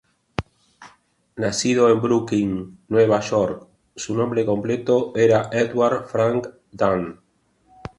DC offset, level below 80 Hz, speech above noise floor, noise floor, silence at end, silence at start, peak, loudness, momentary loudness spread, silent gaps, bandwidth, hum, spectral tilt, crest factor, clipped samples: under 0.1%; -52 dBFS; 40 dB; -60 dBFS; 0.85 s; 0.4 s; -2 dBFS; -20 LUFS; 15 LU; none; 11.5 kHz; none; -5.5 dB/octave; 20 dB; under 0.1%